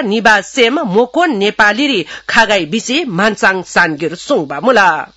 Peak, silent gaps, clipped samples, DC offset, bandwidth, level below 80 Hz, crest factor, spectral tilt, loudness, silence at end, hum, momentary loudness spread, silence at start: 0 dBFS; none; 0.3%; under 0.1%; 12 kHz; -48 dBFS; 12 dB; -3.5 dB/octave; -12 LUFS; 0.1 s; none; 6 LU; 0 s